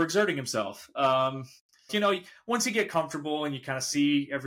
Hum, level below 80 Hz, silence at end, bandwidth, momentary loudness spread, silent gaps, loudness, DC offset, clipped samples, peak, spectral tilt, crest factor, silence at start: none; -74 dBFS; 0 s; 16.5 kHz; 7 LU; 1.60-1.69 s; -28 LUFS; under 0.1%; under 0.1%; -14 dBFS; -3.5 dB/octave; 16 dB; 0 s